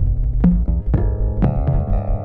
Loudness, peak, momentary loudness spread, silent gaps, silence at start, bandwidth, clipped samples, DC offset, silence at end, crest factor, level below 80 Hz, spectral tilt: -19 LUFS; -2 dBFS; 4 LU; none; 0 s; 2.9 kHz; under 0.1%; under 0.1%; 0 s; 14 dB; -18 dBFS; -12.5 dB/octave